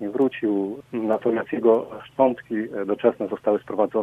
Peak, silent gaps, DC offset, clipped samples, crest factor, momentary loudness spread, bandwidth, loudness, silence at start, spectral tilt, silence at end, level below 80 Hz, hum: -4 dBFS; none; under 0.1%; under 0.1%; 18 dB; 8 LU; 4 kHz; -23 LUFS; 0 s; -8.5 dB/octave; 0 s; -66 dBFS; none